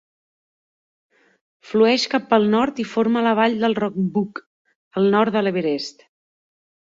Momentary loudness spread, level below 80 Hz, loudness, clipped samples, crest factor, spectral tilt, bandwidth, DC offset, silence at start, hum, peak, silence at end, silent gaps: 10 LU; -64 dBFS; -20 LUFS; under 0.1%; 18 dB; -6 dB/octave; 7.6 kHz; under 0.1%; 1.65 s; none; -2 dBFS; 1 s; 4.46-4.65 s, 4.75-4.91 s